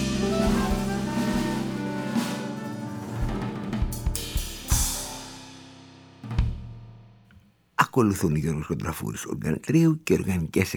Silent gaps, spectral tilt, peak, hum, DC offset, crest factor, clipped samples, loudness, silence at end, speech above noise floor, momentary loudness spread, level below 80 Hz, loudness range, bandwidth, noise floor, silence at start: none; -5.5 dB/octave; -4 dBFS; none; under 0.1%; 24 dB; under 0.1%; -27 LUFS; 0 s; 32 dB; 15 LU; -36 dBFS; 6 LU; over 20 kHz; -57 dBFS; 0 s